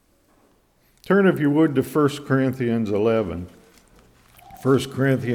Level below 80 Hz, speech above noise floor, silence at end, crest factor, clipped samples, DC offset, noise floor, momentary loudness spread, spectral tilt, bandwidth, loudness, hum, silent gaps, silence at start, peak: -56 dBFS; 41 dB; 0 s; 16 dB; under 0.1%; under 0.1%; -60 dBFS; 8 LU; -7.5 dB/octave; 18 kHz; -21 LUFS; none; none; 1.05 s; -6 dBFS